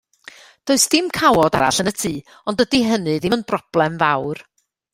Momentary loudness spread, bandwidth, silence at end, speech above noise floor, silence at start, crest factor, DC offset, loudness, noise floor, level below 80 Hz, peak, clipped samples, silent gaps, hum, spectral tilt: 11 LU; 16 kHz; 0.55 s; 26 dB; 0.65 s; 18 dB; under 0.1%; -18 LUFS; -44 dBFS; -50 dBFS; 0 dBFS; under 0.1%; none; none; -3.5 dB/octave